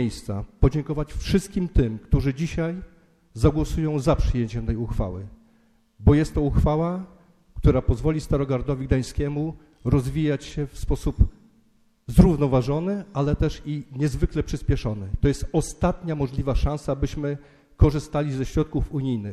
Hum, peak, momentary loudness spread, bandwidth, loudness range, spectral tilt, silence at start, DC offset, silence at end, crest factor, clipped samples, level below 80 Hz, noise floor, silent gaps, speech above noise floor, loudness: none; -2 dBFS; 10 LU; 13.5 kHz; 3 LU; -7.5 dB/octave; 0 s; under 0.1%; 0 s; 20 dB; under 0.1%; -30 dBFS; -60 dBFS; none; 38 dB; -24 LUFS